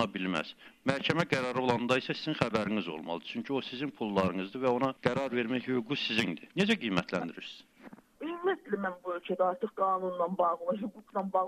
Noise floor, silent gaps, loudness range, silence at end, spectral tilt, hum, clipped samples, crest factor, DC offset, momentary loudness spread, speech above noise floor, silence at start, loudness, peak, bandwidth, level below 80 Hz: -54 dBFS; none; 3 LU; 0 s; -5.5 dB/octave; none; under 0.1%; 26 dB; under 0.1%; 8 LU; 22 dB; 0 s; -32 LUFS; -6 dBFS; 14 kHz; -68 dBFS